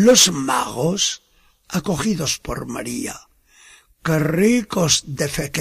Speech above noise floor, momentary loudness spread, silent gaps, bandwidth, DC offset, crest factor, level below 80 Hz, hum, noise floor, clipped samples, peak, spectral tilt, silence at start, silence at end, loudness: 31 dB; 13 LU; none; 15.5 kHz; under 0.1%; 20 dB; -46 dBFS; none; -50 dBFS; under 0.1%; 0 dBFS; -3.5 dB/octave; 0 s; 0 s; -19 LUFS